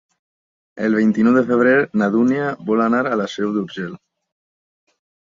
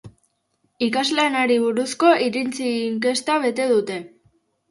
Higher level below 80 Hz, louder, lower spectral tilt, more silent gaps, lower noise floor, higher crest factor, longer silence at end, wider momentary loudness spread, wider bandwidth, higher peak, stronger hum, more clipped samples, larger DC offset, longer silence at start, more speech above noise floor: about the same, -62 dBFS vs -66 dBFS; first, -17 LUFS vs -20 LUFS; first, -7 dB/octave vs -3.5 dB/octave; neither; first, under -90 dBFS vs -69 dBFS; about the same, 16 dB vs 18 dB; first, 1.25 s vs 0.65 s; about the same, 9 LU vs 7 LU; second, 7.4 kHz vs 11.5 kHz; about the same, -2 dBFS vs -4 dBFS; neither; neither; neither; first, 0.75 s vs 0.05 s; first, over 73 dB vs 49 dB